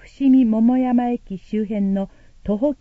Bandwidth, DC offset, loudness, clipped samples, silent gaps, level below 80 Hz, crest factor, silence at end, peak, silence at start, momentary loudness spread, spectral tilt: 4.5 kHz; under 0.1%; -19 LUFS; under 0.1%; none; -46 dBFS; 12 dB; 0.05 s; -8 dBFS; 0.2 s; 12 LU; -9.5 dB/octave